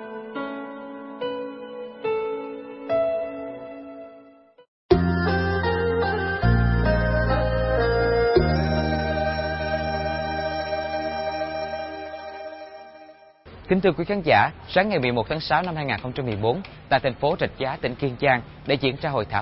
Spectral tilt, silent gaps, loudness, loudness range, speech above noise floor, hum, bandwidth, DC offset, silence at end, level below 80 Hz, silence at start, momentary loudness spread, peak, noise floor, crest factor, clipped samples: -9.5 dB/octave; 4.68-4.89 s; -24 LUFS; 8 LU; 28 dB; none; 5.8 kHz; under 0.1%; 0 s; -36 dBFS; 0 s; 16 LU; -4 dBFS; -51 dBFS; 20 dB; under 0.1%